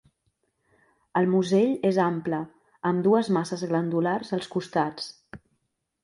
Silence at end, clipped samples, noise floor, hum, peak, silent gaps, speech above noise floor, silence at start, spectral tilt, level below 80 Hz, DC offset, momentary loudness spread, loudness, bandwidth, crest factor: 0.65 s; under 0.1%; -76 dBFS; none; -10 dBFS; none; 52 dB; 1.15 s; -7 dB/octave; -68 dBFS; under 0.1%; 9 LU; -25 LUFS; 11.5 kHz; 18 dB